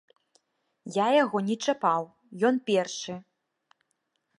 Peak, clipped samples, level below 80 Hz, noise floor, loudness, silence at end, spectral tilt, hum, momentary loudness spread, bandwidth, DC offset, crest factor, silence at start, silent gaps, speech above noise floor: -10 dBFS; under 0.1%; -80 dBFS; -78 dBFS; -27 LUFS; 1.15 s; -4.5 dB/octave; none; 17 LU; 11 kHz; under 0.1%; 18 dB; 0.85 s; none; 52 dB